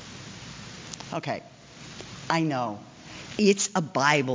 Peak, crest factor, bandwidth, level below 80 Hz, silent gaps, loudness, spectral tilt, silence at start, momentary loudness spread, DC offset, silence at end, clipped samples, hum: -8 dBFS; 20 dB; 7.8 kHz; -62 dBFS; none; -26 LUFS; -4 dB/octave; 0 s; 20 LU; under 0.1%; 0 s; under 0.1%; none